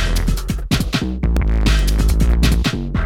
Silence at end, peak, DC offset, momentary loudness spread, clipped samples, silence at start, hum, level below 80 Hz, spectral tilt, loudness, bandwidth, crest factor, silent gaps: 0 s; -2 dBFS; under 0.1%; 5 LU; under 0.1%; 0 s; none; -16 dBFS; -5.5 dB/octave; -18 LUFS; 15.5 kHz; 14 dB; none